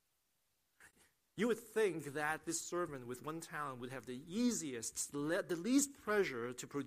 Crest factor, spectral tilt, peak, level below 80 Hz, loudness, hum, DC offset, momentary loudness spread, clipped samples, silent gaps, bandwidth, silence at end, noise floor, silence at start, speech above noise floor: 20 dB; -3.5 dB/octave; -20 dBFS; -76 dBFS; -39 LUFS; none; under 0.1%; 11 LU; under 0.1%; none; 15.5 kHz; 0 s; -83 dBFS; 0.8 s; 43 dB